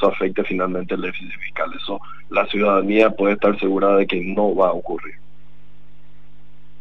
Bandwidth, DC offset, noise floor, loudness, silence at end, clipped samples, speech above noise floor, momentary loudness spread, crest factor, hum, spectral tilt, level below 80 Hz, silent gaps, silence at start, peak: 6.8 kHz; 4%; -52 dBFS; -20 LUFS; 1.65 s; under 0.1%; 33 dB; 13 LU; 18 dB; 50 Hz at -45 dBFS; -7.5 dB/octave; -54 dBFS; none; 0 s; -2 dBFS